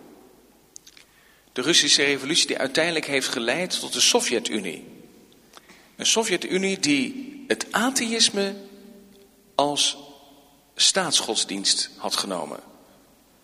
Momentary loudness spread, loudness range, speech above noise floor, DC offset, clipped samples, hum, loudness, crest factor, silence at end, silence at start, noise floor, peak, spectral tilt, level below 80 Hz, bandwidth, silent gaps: 13 LU; 4 LU; 33 dB; under 0.1%; under 0.1%; none; -21 LUFS; 22 dB; 0.8 s; 0.05 s; -56 dBFS; -4 dBFS; -1.5 dB/octave; -68 dBFS; 15.5 kHz; none